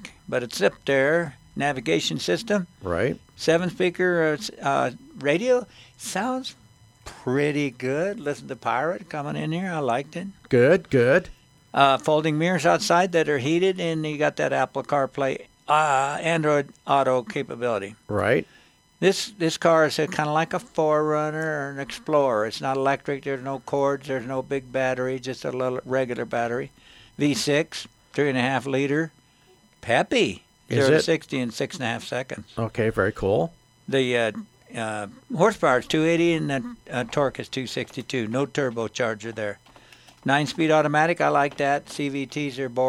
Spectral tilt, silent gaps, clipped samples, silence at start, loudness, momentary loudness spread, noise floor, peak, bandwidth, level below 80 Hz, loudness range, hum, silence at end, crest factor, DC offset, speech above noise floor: -5 dB/octave; none; under 0.1%; 0 s; -24 LUFS; 11 LU; -57 dBFS; -2 dBFS; 14.5 kHz; -58 dBFS; 5 LU; none; 0 s; 22 dB; under 0.1%; 34 dB